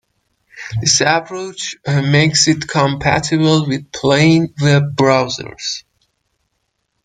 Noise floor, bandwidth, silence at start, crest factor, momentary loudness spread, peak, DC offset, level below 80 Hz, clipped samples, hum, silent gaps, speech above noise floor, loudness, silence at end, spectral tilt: -70 dBFS; 9.4 kHz; 0.55 s; 16 dB; 12 LU; 0 dBFS; under 0.1%; -46 dBFS; under 0.1%; none; none; 55 dB; -14 LUFS; 1.25 s; -4.5 dB/octave